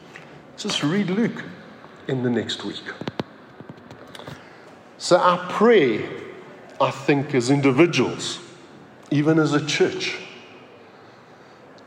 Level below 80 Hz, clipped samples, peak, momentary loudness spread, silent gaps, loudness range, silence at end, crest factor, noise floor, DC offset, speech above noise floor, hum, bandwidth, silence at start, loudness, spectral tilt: -70 dBFS; under 0.1%; -4 dBFS; 25 LU; none; 9 LU; 1.25 s; 20 dB; -47 dBFS; under 0.1%; 27 dB; none; 11.5 kHz; 0 s; -21 LUFS; -5 dB/octave